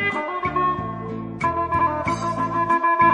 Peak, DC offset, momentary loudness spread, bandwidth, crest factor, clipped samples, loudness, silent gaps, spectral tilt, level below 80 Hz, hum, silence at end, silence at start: -6 dBFS; under 0.1%; 9 LU; 10.5 kHz; 16 dB; under 0.1%; -22 LUFS; none; -6 dB/octave; -46 dBFS; none; 0 s; 0 s